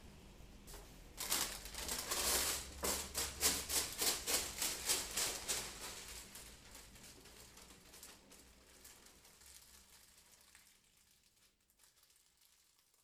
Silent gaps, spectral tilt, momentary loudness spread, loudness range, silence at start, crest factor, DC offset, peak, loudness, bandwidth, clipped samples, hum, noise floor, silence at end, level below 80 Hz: none; -0.5 dB/octave; 25 LU; 22 LU; 0 s; 28 dB; under 0.1%; -18 dBFS; -38 LUFS; 19 kHz; under 0.1%; none; -74 dBFS; 2.45 s; -60 dBFS